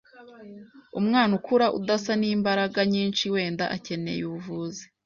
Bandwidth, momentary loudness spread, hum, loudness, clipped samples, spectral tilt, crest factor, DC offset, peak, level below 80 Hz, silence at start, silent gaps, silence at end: 7.4 kHz; 13 LU; none; -25 LUFS; under 0.1%; -5.5 dB/octave; 16 dB; under 0.1%; -10 dBFS; -66 dBFS; 0.15 s; none; 0.2 s